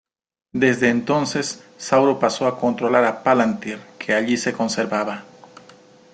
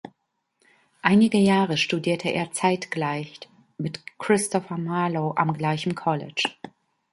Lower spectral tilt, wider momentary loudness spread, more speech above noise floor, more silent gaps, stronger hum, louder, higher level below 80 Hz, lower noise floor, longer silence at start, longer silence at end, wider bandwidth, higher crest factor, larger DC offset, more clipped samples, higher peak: about the same, -4.5 dB/octave vs -5 dB/octave; about the same, 12 LU vs 14 LU; second, 29 dB vs 50 dB; neither; neither; first, -20 LUFS vs -24 LUFS; about the same, -62 dBFS vs -66 dBFS; second, -48 dBFS vs -73 dBFS; first, 0.55 s vs 0.05 s; first, 0.9 s vs 0.45 s; second, 9.4 kHz vs 11.5 kHz; second, 18 dB vs 24 dB; neither; neither; about the same, -2 dBFS vs -2 dBFS